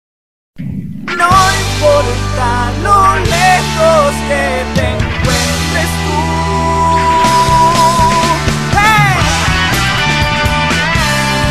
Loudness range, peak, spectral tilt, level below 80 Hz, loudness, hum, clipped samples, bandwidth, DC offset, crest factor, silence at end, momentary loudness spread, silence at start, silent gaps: 3 LU; 0 dBFS; -4 dB/octave; -24 dBFS; -11 LUFS; none; 0.3%; 14.5 kHz; 2%; 12 dB; 0 s; 6 LU; 0.55 s; none